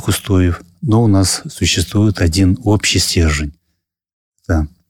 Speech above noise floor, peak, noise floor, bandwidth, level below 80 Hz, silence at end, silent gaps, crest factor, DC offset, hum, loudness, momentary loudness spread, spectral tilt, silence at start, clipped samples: 57 dB; -2 dBFS; -70 dBFS; 17 kHz; -28 dBFS; 0.2 s; 4.13-4.32 s; 12 dB; under 0.1%; none; -15 LUFS; 7 LU; -4.5 dB/octave; 0 s; under 0.1%